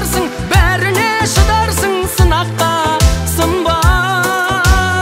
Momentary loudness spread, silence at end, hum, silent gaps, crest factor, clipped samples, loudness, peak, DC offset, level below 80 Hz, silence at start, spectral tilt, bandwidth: 3 LU; 0 s; none; none; 12 dB; under 0.1%; -13 LUFS; 0 dBFS; under 0.1%; -18 dBFS; 0 s; -4 dB/octave; 16.5 kHz